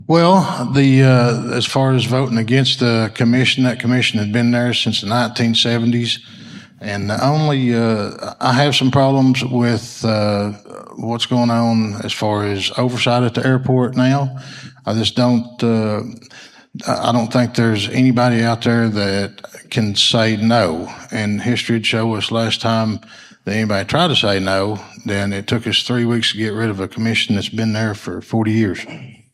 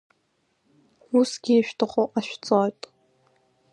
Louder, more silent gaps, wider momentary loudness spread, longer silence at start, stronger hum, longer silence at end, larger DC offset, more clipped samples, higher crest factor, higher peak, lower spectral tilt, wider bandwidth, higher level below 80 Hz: first, -16 LUFS vs -24 LUFS; neither; about the same, 11 LU vs 9 LU; second, 0 s vs 1.1 s; neither; second, 0.25 s vs 1 s; neither; neither; about the same, 16 dB vs 20 dB; first, 0 dBFS vs -6 dBFS; about the same, -5.5 dB/octave vs -5 dB/octave; about the same, 12.5 kHz vs 11.5 kHz; first, -56 dBFS vs -74 dBFS